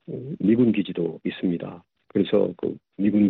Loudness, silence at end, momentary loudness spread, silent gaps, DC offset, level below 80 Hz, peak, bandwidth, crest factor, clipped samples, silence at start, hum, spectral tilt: -24 LUFS; 0 s; 11 LU; none; under 0.1%; -64 dBFS; -8 dBFS; 4.2 kHz; 14 dB; under 0.1%; 0.1 s; none; -10.5 dB/octave